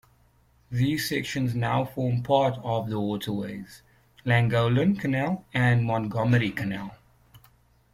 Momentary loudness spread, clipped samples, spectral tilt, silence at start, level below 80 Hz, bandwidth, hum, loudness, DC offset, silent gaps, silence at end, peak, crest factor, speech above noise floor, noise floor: 11 LU; under 0.1%; -6.5 dB/octave; 0.7 s; -56 dBFS; 15.5 kHz; none; -26 LUFS; under 0.1%; none; 0.55 s; -8 dBFS; 18 dB; 37 dB; -62 dBFS